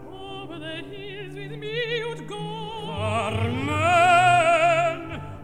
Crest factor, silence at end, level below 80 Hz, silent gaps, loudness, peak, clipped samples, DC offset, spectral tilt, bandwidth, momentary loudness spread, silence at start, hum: 18 dB; 0 s; -52 dBFS; none; -22 LUFS; -6 dBFS; under 0.1%; 0.5%; -5 dB/octave; 12 kHz; 19 LU; 0 s; none